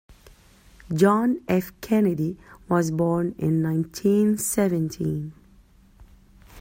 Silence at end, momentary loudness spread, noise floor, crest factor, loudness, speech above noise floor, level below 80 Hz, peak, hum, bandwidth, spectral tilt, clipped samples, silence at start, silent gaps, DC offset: 0 s; 9 LU; -54 dBFS; 18 dB; -23 LUFS; 31 dB; -54 dBFS; -6 dBFS; none; 16.5 kHz; -6.5 dB/octave; under 0.1%; 0.1 s; none; under 0.1%